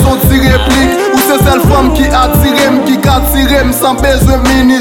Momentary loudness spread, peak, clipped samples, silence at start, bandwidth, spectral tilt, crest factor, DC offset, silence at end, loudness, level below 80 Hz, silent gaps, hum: 2 LU; 0 dBFS; under 0.1%; 0 s; 19 kHz; -5 dB/octave; 8 dB; under 0.1%; 0 s; -8 LUFS; -14 dBFS; none; none